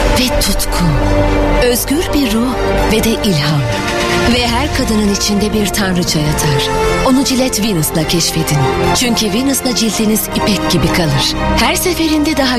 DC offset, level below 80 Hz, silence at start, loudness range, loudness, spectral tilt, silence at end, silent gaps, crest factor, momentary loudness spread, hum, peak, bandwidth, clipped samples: 0.6%; -22 dBFS; 0 s; 1 LU; -13 LUFS; -4 dB/octave; 0 s; none; 12 dB; 2 LU; none; 0 dBFS; 14 kHz; under 0.1%